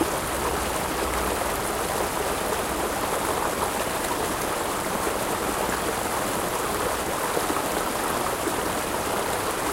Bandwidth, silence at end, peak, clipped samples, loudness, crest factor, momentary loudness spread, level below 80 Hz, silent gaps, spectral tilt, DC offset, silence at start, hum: 16 kHz; 0 s; -10 dBFS; under 0.1%; -26 LUFS; 18 dB; 1 LU; -42 dBFS; none; -3 dB/octave; under 0.1%; 0 s; none